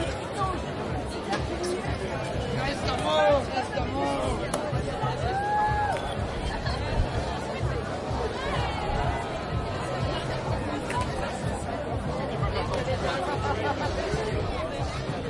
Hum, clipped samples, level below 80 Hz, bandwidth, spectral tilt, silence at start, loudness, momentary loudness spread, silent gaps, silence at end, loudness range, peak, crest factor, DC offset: none; under 0.1%; -38 dBFS; 11.5 kHz; -5.5 dB/octave; 0 s; -29 LUFS; 5 LU; none; 0 s; 3 LU; -10 dBFS; 18 dB; under 0.1%